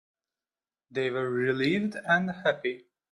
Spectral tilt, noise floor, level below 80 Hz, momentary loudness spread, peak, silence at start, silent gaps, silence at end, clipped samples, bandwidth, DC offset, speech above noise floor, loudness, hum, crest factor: -6.5 dB/octave; under -90 dBFS; -70 dBFS; 9 LU; -10 dBFS; 0.9 s; none; 0.3 s; under 0.1%; 11 kHz; under 0.1%; over 62 dB; -28 LUFS; none; 20 dB